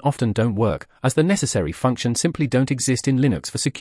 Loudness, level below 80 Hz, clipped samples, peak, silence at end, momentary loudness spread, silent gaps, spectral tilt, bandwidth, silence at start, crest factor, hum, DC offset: -21 LUFS; -48 dBFS; under 0.1%; -4 dBFS; 0 s; 4 LU; none; -5.5 dB/octave; 12 kHz; 0.05 s; 16 dB; none; under 0.1%